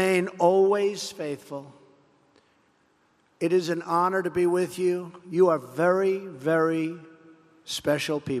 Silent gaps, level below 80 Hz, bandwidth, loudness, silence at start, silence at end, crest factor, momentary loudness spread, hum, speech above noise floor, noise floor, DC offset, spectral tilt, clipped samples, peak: none; -70 dBFS; 14 kHz; -25 LUFS; 0 s; 0 s; 18 dB; 11 LU; none; 41 dB; -65 dBFS; under 0.1%; -5.5 dB/octave; under 0.1%; -8 dBFS